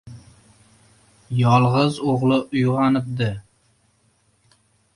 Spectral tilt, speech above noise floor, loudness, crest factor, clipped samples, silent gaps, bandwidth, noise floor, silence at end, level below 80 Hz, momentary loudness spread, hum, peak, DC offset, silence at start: -7.5 dB/octave; 44 dB; -20 LUFS; 18 dB; under 0.1%; none; 11 kHz; -63 dBFS; 1.55 s; -54 dBFS; 10 LU; none; -4 dBFS; under 0.1%; 0.05 s